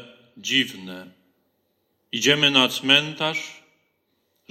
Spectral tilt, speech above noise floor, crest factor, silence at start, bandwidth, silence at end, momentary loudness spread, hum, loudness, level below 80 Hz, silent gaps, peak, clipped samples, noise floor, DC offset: -2.5 dB/octave; 49 dB; 22 dB; 0 s; 16.5 kHz; 0.95 s; 22 LU; none; -19 LUFS; -68 dBFS; none; -2 dBFS; under 0.1%; -71 dBFS; under 0.1%